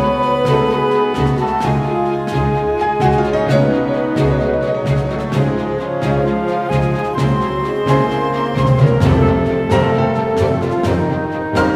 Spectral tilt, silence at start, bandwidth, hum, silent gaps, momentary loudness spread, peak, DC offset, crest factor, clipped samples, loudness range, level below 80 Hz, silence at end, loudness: -8 dB/octave; 0 s; 11.5 kHz; none; none; 5 LU; 0 dBFS; under 0.1%; 14 dB; under 0.1%; 2 LU; -32 dBFS; 0 s; -16 LUFS